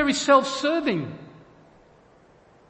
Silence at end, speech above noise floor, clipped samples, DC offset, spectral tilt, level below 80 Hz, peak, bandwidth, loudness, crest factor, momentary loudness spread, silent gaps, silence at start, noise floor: 1.4 s; 33 dB; under 0.1%; under 0.1%; -4 dB/octave; -60 dBFS; -4 dBFS; 8.8 kHz; -22 LUFS; 20 dB; 18 LU; none; 0 s; -55 dBFS